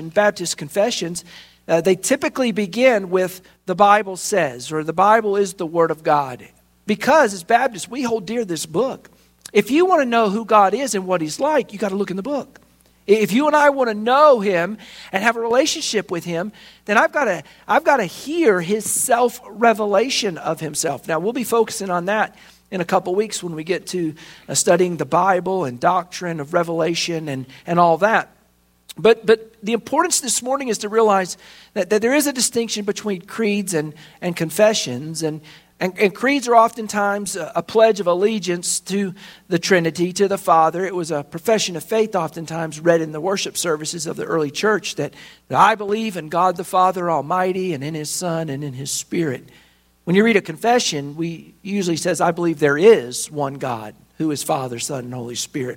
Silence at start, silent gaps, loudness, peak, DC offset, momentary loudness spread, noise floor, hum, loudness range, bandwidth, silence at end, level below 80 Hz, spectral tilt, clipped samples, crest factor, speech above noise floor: 0 s; none; -19 LUFS; 0 dBFS; under 0.1%; 11 LU; -58 dBFS; none; 3 LU; 16.5 kHz; 0 s; -62 dBFS; -4 dB/octave; under 0.1%; 18 dB; 40 dB